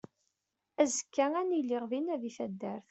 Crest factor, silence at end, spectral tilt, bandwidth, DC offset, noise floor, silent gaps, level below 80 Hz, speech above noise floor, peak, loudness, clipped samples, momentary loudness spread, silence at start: 20 dB; 0.1 s; -4 dB/octave; 8.2 kHz; under 0.1%; -85 dBFS; none; -82 dBFS; 52 dB; -14 dBFS; -33 LUFS; under 0.1%; 9 LU; 0.8 s